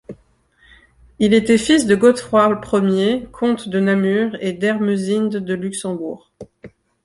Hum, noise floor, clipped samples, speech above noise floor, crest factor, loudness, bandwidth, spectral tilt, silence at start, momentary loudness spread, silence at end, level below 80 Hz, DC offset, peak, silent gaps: none; -56 dBFS; under 0.1%; 39 dB; 16 dB; -17 LUFS; 11.5 kHz; -5.5 dB/octave; 0.1 s; 10 LU; 0.4 s; -52 dBFS; under 0.1%; -2 dBFS; none